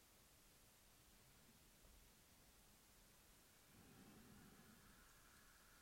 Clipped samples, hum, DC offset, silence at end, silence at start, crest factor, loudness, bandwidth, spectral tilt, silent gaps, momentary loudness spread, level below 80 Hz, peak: under 0.1%; none; under 0.1%; 0 s; 0 s; 16 dB; -69 LUFS; 16 kHz; -3 dB/octave; none; 4 LU; -78 dBFS; -52 dBFS